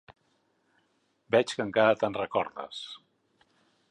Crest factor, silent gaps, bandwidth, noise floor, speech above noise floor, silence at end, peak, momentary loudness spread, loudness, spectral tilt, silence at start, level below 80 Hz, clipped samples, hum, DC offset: 20 dB; none; 11 kHz; -72 dBFS; 45 dB; 0.95 s; -10 dBFS; 16 LU; -28 LUFS; -4.5 dB/octave; 0.1 s; -70 dBFS; under 0.1%; none; under 0.1%